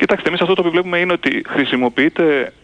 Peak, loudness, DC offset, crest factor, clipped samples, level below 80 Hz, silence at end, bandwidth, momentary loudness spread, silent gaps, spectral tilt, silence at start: -2 dBFS; -16 LUFS; under 0.1%; 14 dB; under 0.1%; -54 dBFS; 0.15 s; 9.4 kHz; 3 LU; none; -6.5 dB/octave; 0 s